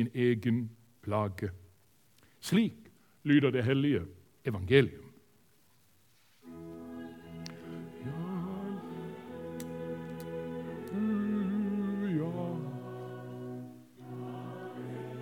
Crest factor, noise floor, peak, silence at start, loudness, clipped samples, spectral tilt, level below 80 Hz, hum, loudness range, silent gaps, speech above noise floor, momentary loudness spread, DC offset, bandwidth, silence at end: 24 dB; -68 dBFS; -10 dBFS; 0 s; -34 LUFS; under 0.1%; -7 dB/octave; -70 dBFS; none; 12 LU; none; 39 dB; 18 LU; under 0.1%; 18 kHz; 0 s